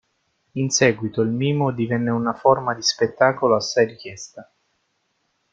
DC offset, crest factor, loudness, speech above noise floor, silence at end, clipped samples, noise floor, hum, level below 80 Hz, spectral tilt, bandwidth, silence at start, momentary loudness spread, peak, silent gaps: under 0.1%; 20 dB; -20 LUFS; 50 dB; 1.1 s; under 0.1%; -70 dBFS; none; -60 dBFS; -4.5 dB/octave; 9.4 kHz; 0.55 s; 16 LU; -2 dBFS; none